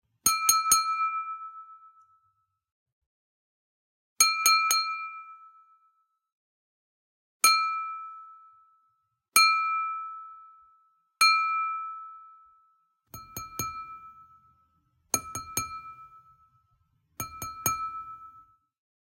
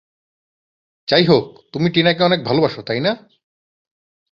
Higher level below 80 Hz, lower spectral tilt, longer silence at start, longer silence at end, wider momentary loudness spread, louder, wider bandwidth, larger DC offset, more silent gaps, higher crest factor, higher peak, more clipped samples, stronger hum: second, -68 dBFS vs -56 dBFS; second, 1 dB/octave vs -7 dB/octave; second, 0.25 s vs 1.1 s; second, 0.6 s vs 1.15 s; first, 23 LU vs 13 LU; second, -25 LUFS vs -17 LUFS; first, 16.5 kHz vs 7 kHz; neither; first, 2.72-2.86 s, 2.92-4.16 s, 6.32-7.40 s vs none; first, 26 dB vs 18 dB; second, -6 dBFS vs -2 dBFS; neither; neither